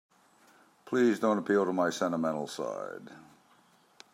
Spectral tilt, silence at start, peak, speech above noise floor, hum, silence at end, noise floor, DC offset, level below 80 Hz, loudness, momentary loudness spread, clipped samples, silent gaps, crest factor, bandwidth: -5.5 dB/octave; 0.85 s; -14 dBFS; 34 dB; none; 0.95 s; -64 dBFS; under 0.1%; -82 dBFS; -30 LUFS; 15 LU; under 0.1%; none; 18 dB; 15.5 kHz